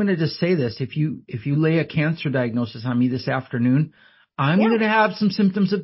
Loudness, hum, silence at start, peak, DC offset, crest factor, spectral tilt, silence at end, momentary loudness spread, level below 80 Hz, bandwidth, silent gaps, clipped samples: -21 LUFS; none; 0 s; -6 dBFS; under 0.1%; 16 dB; -11 dB/octave; 0 s; 8 LU; -58 dBFS; 5.8 kHz; none; under 0.1%